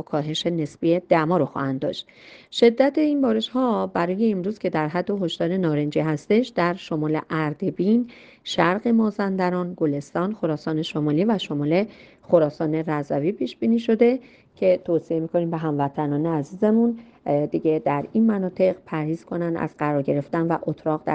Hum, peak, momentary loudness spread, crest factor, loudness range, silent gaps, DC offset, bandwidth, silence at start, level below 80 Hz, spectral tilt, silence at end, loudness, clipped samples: none; -4 dBFS; 7 LU; 20 dB; 2 LU; none; under 0.1%; 8.6 kHz; 0.1 s; -62 dBFS; -7.5 dB/octave; 0 s; -23 LUFS; under 0.1%